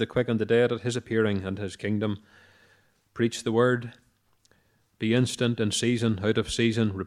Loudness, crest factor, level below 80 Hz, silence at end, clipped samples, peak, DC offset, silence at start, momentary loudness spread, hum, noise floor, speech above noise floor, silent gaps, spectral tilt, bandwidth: -26 LUFS; 18 dB; -58 dBFS; 0 s; under 0.1%; -8 dBFS; under 0.1%; 0 s; 9 LU; none; -66 dBFS; 40 dB; none; -5.5 dB/octave; 13.5 kHz